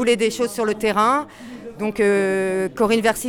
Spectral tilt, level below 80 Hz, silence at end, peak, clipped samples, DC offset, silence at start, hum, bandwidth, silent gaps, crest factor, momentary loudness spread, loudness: -4 dB/octave; -52 dBFS; 0 s; -4 dBFS; under 0.1%; under 0.1%; 0 s; none; 19 kHz; none; 14 dB; 11 LU; -20 LUFS